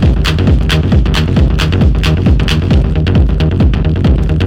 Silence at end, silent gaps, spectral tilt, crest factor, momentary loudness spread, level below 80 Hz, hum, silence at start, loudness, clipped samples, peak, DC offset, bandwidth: 0 s; none; -7 dB/octave; 8 dB; 1 LU; -14 dBFS; none; 0 s; -11 LUFS; under 0.1%; 0 dBFS; under 0.1%; 12.5 kHz